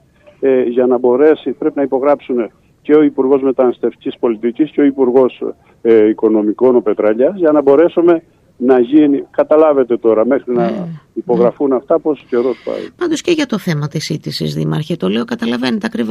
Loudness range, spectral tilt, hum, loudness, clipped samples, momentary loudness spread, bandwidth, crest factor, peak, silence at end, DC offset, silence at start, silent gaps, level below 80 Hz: 5 LU; -7 dB/octave; none; -13 LUFS; under 0.1%; 9 LU; 13 kHz; 12 dB; 0 dBFS; 0 s; under 0.1%; 0.4 s; none; -56 dBFS